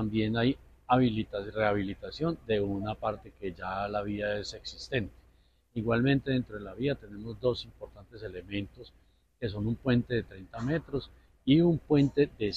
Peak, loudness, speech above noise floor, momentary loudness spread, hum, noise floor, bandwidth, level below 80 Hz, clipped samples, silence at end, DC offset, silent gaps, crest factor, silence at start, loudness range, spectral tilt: -12 dBFS; -31 LUFS; 34 dB; 15 LU; none; -64 dBFS; 8 kHz; -52 dBFS; under 0.1%; 0 s; under 0.1%; none; 18 dB; 0 s; 6 LU; -7.5 dB/octave